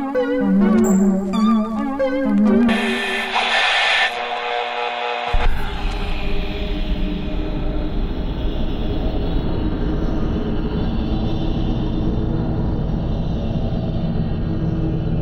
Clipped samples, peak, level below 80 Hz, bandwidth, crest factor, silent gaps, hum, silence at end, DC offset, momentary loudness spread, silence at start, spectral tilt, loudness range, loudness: under 0.1%; -6 dBFS; -24 dBFS; 15.5 kHz; 14 dB; none; none; 0 s; under 0.1%; 10 LU; 0 s; -6 dB/octave; 8 LU; -20 LUFS